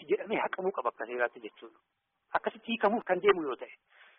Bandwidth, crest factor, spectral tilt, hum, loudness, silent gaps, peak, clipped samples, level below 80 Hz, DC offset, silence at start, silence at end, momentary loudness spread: 3.9 kHz; 20 dB; 0.5 dB/octave; none; -32 LUFS; none; -12 dBFS; under 0.1%; -76 dBFS; under 0.1%; 0 s; 0.45 s; 14 LU